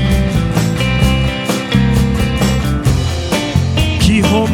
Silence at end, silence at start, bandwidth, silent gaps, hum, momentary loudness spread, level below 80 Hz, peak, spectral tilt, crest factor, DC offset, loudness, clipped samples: 0 s; 0 s; 17.5 kHz; none; none; 4 LU; -20 dBFS; 0 dBFS; -5.5 dB/octave; 12 dB; under 0.1%; -14 LUFS; under 0.1%